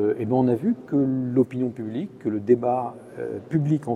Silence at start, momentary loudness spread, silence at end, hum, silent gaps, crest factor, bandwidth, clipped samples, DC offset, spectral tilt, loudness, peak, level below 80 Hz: 0 s; 11 LU; 0 s; none; none; 16 dB; 9.2 kHz; under 0.1%; under 0.1%; -10 dB/octave; -24 LUFS; -6 dBFS; -64 dBFS